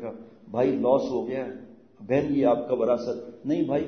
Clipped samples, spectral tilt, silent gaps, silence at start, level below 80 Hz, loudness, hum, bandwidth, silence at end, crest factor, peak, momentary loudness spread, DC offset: under 0.1%; -8 dB/octave; none; 0 s; -64 dBFS; -26 LUFS; none; 6.6 kHz; 0 s; 18 dB; -8 dBFS; 14 LU; under 0.1%